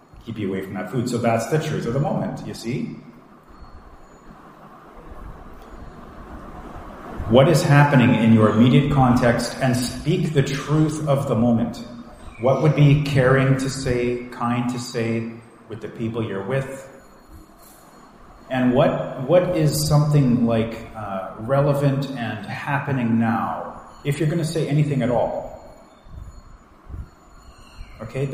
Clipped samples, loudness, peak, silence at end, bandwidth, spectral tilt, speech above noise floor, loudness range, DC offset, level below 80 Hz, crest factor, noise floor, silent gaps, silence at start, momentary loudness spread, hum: under 0.1%; -20 LUFS; 0 dBFS; 0 s; 15.5 kHz; -7 dB/octave; 28 dB; 13 LU; under 0.1%; -44 dBFS; 20 dB; -47 dBFS; none; 0.15 s; 23 LU; none